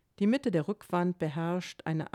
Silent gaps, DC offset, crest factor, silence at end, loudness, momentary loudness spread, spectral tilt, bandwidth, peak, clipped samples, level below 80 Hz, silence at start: none; under 0.1%; 14 dB; 0.05 s; -31 LUFS; 7 LU; -7.5 dB/octave; 13 kHz; -16 dBFS; under 0.1%; -70 dBFS; 0.2 s